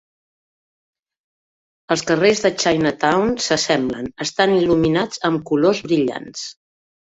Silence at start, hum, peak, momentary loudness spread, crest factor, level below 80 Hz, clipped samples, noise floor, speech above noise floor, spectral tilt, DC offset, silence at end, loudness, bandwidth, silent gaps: 1.9 s; none; -2 dBFS; 9 LU; 18 dB; -52 dBFS; under 0.1%; under -90 dBFS; over 72 dB; -4.5 dB/octave; under 0.1%; 0.6 s; -18 LUFS; 8 kHz; none